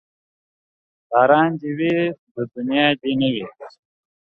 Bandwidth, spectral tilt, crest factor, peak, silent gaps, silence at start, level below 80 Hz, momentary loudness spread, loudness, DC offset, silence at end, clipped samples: 4.7 kHz; -8 dB/octave; 20 dB; -2 dBFS; 2.19-2.35 s; 1.1 s; -64 dBFS; 14 LU; -19 LUFS; under 0.1%; 0.6 s; under 0.1%